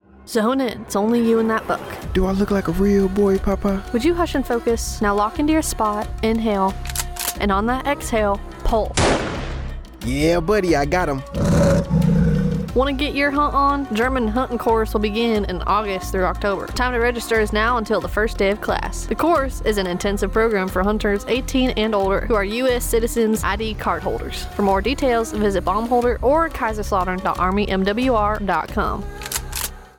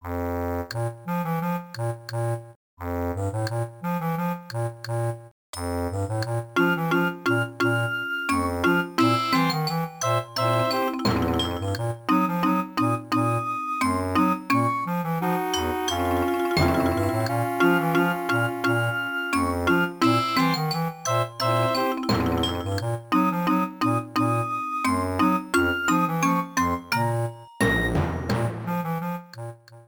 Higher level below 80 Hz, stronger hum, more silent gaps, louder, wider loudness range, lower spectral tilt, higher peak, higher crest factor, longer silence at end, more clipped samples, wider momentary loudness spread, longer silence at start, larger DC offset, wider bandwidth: first, -30 dBFS vs -46 dBFS; neither; second, none vs 2.56-2.77 s, 5.31-5.53 s; first, -20 LUFS vs -24 LUFS; second, 2 LU vs 6 LU; about the same, -5.5 dB/octave vs -5.5 dB/octave; about the same, -6 dBFS vs -8 dBFS; about the same, 14 dB vs 16 dB; about the same, 0.1 s vs 0.05 s; neither; about the same, 6 LU vs 8 LU; first, 0.2 s vs 0.05 s; neither; about the same, 19 kHz vs over 20 kHz